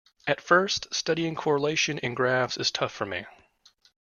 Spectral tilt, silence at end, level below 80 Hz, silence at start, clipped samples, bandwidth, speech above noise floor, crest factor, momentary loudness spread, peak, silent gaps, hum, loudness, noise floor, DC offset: -3.5 dB/octave; 0.8 s; -66 dBFS; 0.25 s; under 0.1%; 7.4 kHz; 35 dB; 22 dB; 8 LU; -6 dBFS; none; none; -26 LUFS; -61 dBFS; under 0.1%